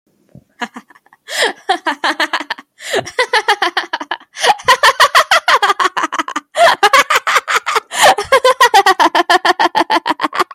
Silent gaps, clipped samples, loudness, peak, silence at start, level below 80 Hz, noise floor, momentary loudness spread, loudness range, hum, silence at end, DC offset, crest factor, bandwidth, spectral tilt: none; under 0.1%; -12 LUFS; 0 dBFS; 0.6 s; -58 dBFS; -45 dBFS; 13 LU; 6 LU; none; 0.1 s; under 0.1%; 14 dB; 17 kHz; -0.5 dB/octave